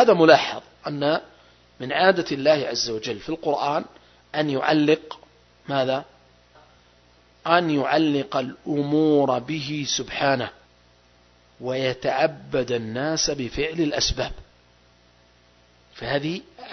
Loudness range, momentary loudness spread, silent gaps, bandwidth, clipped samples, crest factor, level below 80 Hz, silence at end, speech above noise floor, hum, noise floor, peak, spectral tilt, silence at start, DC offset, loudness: 4 LU; 12 LU; none; 6.4 kHz; under 0.1%; 24 dB; -48 dBFS; 0 s; 35 dB; 60 Hz at -60 dBFS; -57 dBFS; 0 dBFS; -4.5 dB/octave; 0 s; under 0.1%; -23 LUFS